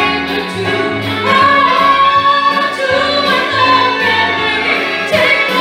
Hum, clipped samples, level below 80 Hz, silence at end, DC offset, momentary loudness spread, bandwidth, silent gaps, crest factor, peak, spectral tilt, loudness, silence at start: none; under 0.1%; -46 dBFS; 0 s; under 0.1%; 7 LU; 16 kHz; none; 12 dB; 0 dBFS; -4 dB/octave; -11 LUFS; 0 s